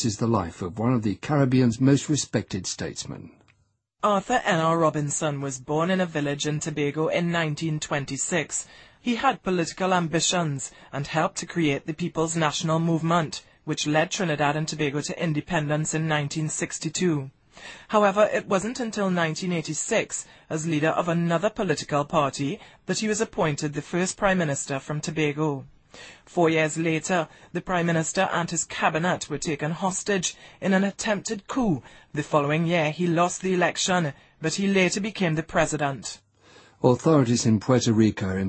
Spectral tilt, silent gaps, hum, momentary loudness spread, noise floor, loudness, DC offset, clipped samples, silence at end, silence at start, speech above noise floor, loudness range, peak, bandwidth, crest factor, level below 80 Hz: -4.5 dB/octave; none; none; 10 LU; -68 dBFS; -25 LUFS; under 0.1%; under 0.1%; 0 s; 0 s; 43 dB; 2 LU; -4 dBFS; 8.8 kHz; 20 dB; -54 dBFS